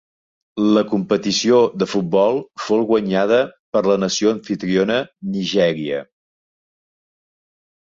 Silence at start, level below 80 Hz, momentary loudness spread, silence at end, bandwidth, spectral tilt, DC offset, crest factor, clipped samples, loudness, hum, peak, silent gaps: 0.55 s; -60 dBFS; 9 LU; 1.9 s; 7.8 kHz; -5 dB/octave; under 0.1%; 16 dB; under 0.1%; -18 LUFS; none; -2 dBFS; 3.59-3.73 s